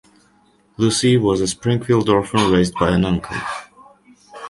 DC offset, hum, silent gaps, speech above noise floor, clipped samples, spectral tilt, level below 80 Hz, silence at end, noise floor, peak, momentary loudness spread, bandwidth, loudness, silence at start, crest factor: under 0.1%; none; none; 40 dB; under 0.1%; -5.5 dB/octave; -42 dBFS; 0 s; -56 dBFS; -2 dBFS; 10 LU; 11.5 kHz; -18 LUFS; 0.8 s; 18 dB